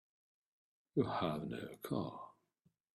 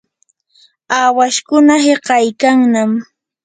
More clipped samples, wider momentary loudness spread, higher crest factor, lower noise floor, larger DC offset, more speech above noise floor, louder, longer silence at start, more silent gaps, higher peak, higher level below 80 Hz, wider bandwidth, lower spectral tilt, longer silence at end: neither; first, 12 LU vs 7 LU; first, 22 dB vs 14 dB; first, -79 dBFS vs -61 dBFS; neither; second, 39 dB vs 50 dB; second, -41 LUFS vs -12 LUFS; about the same, 0.95 s vs 0.9 s; neither; second, -20 dBFS vs 0 dBFS; second, -74 dBFS vs -60 dBFS; first, 15 kHz vs 9.4 kHz; first, -7 dB/octave vs -3.5 dB/octave; first, 0.65 s vs 0.4 s